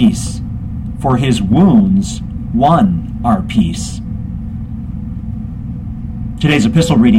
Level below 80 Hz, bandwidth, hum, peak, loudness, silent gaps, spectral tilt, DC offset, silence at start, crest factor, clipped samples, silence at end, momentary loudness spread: -28 dBFS; 12.5 kHz; none; 0 dBFS; -15 LUFS; none; -6.5 dB/octave; under 0.1%; 0 s; 14 dB; under 0.1%; 0 s; 14 LU